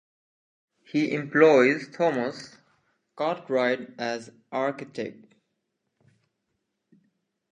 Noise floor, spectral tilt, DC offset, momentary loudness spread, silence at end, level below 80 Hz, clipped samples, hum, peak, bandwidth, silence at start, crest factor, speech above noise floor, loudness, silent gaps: -79 dBFS; -6 dB/octave; under 0.1%; 18 LU; 2.4 s; -80 dBFS; under 0.1%; none; -4 dBFS; 9.2 kHz; 0.95 s; 22 dB; 54 dB; -25 LUFS; none